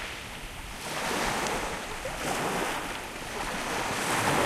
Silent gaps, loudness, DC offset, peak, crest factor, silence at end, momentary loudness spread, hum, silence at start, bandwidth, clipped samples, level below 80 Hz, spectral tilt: none; -31 LUFS; under 0.1%; -12 dBFS; 20 dB; 0 s; 10 LU; none; 0 s; 16 kHz; under 0.1%; -46 dBFS; -3 dB/octave